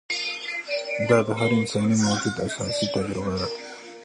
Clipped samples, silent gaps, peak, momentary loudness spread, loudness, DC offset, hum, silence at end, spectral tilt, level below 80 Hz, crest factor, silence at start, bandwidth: under 0.1%; none; -6 dBFS; 8 LU; -24 LUFS; under 0.1%; none; 0 s; -4.5 dB/octave; -52 dBFS; 20 dB; 0.1 s; 11.5 kHz